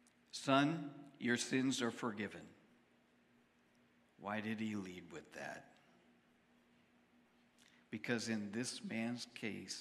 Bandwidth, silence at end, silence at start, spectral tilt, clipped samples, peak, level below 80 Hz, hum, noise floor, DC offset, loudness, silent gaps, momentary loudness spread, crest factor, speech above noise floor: 14 kHz; 0 s; 0.35 s; -4 dB/octave; under 0.1%; -18 dBFS; -88 dBFS; none; -73 dBFS; under 0.1%; -41 LUFS; none; 16 LU; 26 dB; 32 dB